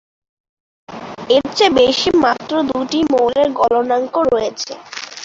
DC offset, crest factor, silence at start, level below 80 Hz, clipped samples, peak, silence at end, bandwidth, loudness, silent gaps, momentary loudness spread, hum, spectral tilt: under 0.1%; 16 dB; 0.9 s; -50 dBFS; under 0.1%; -2 dBFS; 0 s; 7.8 kHz; -15 LUFS; none; 16 LU; none; -3.5 dB/octave